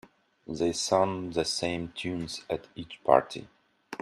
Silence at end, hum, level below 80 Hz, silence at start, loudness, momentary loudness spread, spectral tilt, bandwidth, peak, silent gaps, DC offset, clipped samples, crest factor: 0.05 s; none; -60 dBFS; 0.5 s; -29 LUFS; 17 LU; -4 dB/octave; 13 kHz; -4 dBFS; none; under 0.1%; under 0.1%; 26 dB